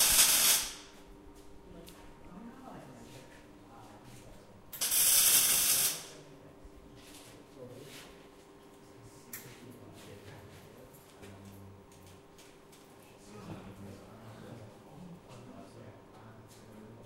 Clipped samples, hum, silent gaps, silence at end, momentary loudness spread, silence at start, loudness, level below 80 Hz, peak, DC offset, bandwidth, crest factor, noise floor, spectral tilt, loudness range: under 0.1%; none; none; 0.1 s; 30 LU; 0 s; -25 LUFS; -62 dBFS; -10 dBFS; under 0.1%; 16 kHz; 26 dB; -56 dBFS; 0 dB/octave; 24 LU